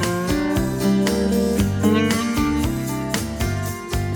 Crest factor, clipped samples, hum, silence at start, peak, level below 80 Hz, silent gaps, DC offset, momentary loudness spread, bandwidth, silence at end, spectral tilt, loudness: 16 dB; under 0.1%; none; 0 s; -4 dBFS; -32 dBFS; none; under 0.1%; 6 LU; 19.5 kHz; 0 s; -5.5 dB/octave; -21 LUFS